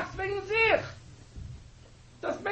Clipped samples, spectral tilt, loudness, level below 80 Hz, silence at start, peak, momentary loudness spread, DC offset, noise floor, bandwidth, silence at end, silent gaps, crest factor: under 0.1%; -5 dB/octave; -28 LUFS; -50 dBFS; 0 s; -12 dBFS; 26 LU; under 0.1%; -53 dBFS; 8.4 kHz; 0 s; none; 20 dB